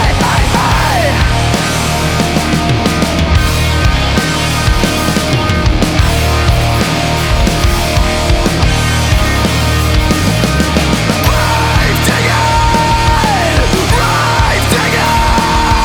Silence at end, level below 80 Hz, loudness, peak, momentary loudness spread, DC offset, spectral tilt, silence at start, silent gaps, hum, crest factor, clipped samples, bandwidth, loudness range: 0 s; -16 dBFS; -11 LUFS; 0 dBFS; 2 LU; under 0.1%; -4.5 dB/octave; 0 s; none; none; 10 dB; under 0.1%; over 20 kHz; 1 LU